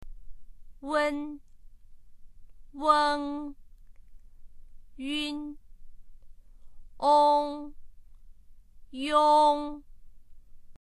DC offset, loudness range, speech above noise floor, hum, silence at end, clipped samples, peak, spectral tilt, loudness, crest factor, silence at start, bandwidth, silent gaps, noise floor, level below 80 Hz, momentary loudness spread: under 0.1%; 12 LU; 24 dB; none; 0.05 s; under 0.1%; -10 dBFS; -3.5 dB/octave; -26 LUFS; 22 dB; 0 s; 12 kHz; none; -50 dBFS; -50 dBFS; 23 LU